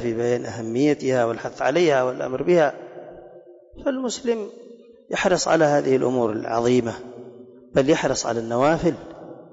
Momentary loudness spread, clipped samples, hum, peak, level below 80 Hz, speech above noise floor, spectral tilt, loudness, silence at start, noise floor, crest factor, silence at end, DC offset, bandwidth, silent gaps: 18 LU; under 0.1%; none; -8 dBFS; -54 dBFS; 25 dB; -5 dB/octave; -22 LUFS; 0 s; -46 dBFS; 14 dB; 0.1 s; under 0.1%; 8 kHz; none